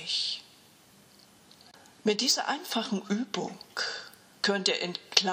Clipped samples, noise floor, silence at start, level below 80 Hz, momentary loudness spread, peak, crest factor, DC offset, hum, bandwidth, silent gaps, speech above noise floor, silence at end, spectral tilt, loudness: under 0.1%; -58 dBFS; 0 s; -82 dBFS; 11 LU; -2 dBFS; 30 dB; under 0.1%; none; 16 kHz; none; 28 dB; 0 s; -2.5 dB/octave; -29 LUFS